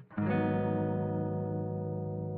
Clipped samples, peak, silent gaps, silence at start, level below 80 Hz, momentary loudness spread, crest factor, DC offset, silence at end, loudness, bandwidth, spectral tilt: under 0.1%; -18 dBFS; none; 0 s; -62 dBFS; 6 LU; 14 dB; under 0.1%; 0 s; -33 LUFS; 4.5 kHz; -9 dB/octave